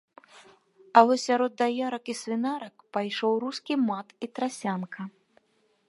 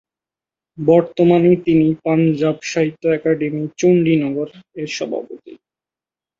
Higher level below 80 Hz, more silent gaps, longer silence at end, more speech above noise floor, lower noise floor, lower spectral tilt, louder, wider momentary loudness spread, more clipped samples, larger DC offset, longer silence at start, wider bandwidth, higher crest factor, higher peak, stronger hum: second, -84 dBFS vs -58 dBFS; neither; about the same, 0.8 s vs 0.85 s; second, 43 dB vs 74 dB; second, -69 dBFS vs -90 dBFS; second, -4.5 dB/octave vs -7 dB/octave; second, -27 LUFS vs -17 LUFS; first, 15 LU vs 12 LU; neither; neither; second, 0.35 s vs 0.8 s; first, 11.5 kHz vs 7.6 kHz; first, 26 dB vs 16 dB; about the same, -2 dBFS vs -2 dBFS; neither